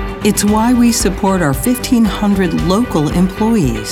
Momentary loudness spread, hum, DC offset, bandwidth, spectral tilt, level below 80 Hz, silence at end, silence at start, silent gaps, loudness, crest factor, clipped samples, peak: 4 LU; none; under 0.1%; 18.5 kHz; -5 dB/octave; -28 dBFS; 0 s; 0 s; none; -13 LUFS; 12 dB; under 0.1%; -2 dBFS